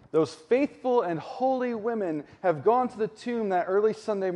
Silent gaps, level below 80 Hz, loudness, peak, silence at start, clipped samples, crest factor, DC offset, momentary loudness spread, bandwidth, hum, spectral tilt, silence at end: none; -72 dBFS; -27 LUFS; -10 dBFS; 0.15 s; under 0.1%; 16 dB; under 0.1%; 6 LU; 10.5 kHz; none; -7 dB/octave; 0 s